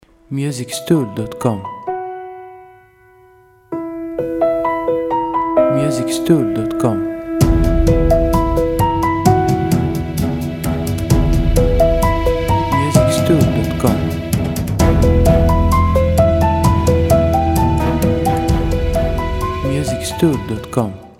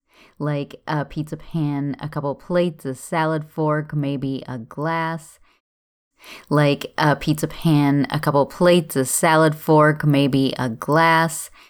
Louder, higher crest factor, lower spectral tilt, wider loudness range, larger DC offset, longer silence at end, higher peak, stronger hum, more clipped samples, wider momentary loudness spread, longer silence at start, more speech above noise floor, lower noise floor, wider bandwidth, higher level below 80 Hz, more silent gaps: first, -16 LUFS vs -20 LUFS; about the same, 14 dB vs 16 dB; first, -7 dB/octave vs -5.5 dB/octave; about the same, 8 LU vs 8 LU; neither; second, 0.1 s vs 0.25 s; first, 0 dBFS vs -4 dBFS; neither; neither; second, 9 LU vs 12 LU; about the same, 0.3 s vs 0.4 s; second, 30 dB vs over 70 dB; second, -47 dBFS vs under -90 dBFS; second, 16.5 kHz vs 18.5 kHz; first, -22 dBFS vs -52 dBFS; second, none vs 5.60-6.11 s